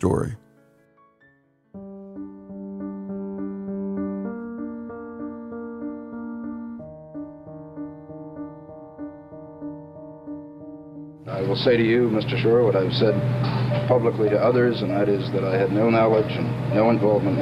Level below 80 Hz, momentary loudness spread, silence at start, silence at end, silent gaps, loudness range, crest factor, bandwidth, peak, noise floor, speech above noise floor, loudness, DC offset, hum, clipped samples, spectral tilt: -54 dBFS; 21 LU; 0 s; 0 s; none; 18 LU; 18 dB; 10.5 kHz; -6 dBFS; -60 dBFS; 40 dB; -23 LUFS; under 0.1%; none; under 0.1%; -8 dB/octave